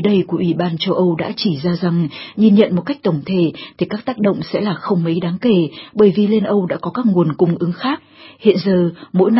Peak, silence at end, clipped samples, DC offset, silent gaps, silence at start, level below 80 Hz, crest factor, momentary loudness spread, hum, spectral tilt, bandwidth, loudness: 0 dBFS; 0 s; under 0.1%; under 0.1%; none; 0 s; -56 dBFS; 16 dB; 8 LU; none; -11 dB/octave; 5.8 kHz; -17 LUFS